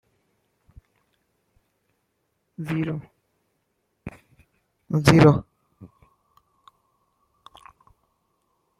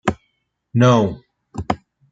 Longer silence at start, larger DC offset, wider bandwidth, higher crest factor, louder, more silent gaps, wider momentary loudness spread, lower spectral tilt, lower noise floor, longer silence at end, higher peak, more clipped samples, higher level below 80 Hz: first, 2.6 s vs 0.05 s; neither; first, 13.5 kHz vs 7.8 kHz; first, 26 dB vs 18 dB; about the same, -20 LUFS vs -19 LUFS; neither; first, 28 LU vs 22 LU; about the same, -7 dB/octave vs -7 dB/octave; first, -74 dBFS vs -70 dBFS; first, 2.95 s vs 0.35 s; about the same, -2 dBFS vs -2 dBFS; neither; second, -52 dBFS vs -46 dBFS